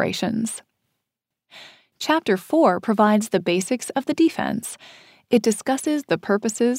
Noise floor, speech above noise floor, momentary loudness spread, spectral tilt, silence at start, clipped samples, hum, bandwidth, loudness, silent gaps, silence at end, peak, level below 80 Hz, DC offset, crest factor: -83 dBFS; 62 dB; 11 LU; -4.5 dB/octave; 0 s; under 0.1%; none; 16 kHz; -21 LUFS; none; 0 s; -4 dBFS; -66 dBFS; under 0.1%; 18 dB